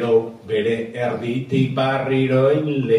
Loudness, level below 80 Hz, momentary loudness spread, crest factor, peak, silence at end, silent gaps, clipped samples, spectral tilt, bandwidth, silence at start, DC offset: -20 LUFS; -58 dBFS; 7 LU; 14 dB; -6 dBFS; 0 s; none; under 0.1%; -8 dB/octave; 10.5 kHz; 0 s; under 0.1%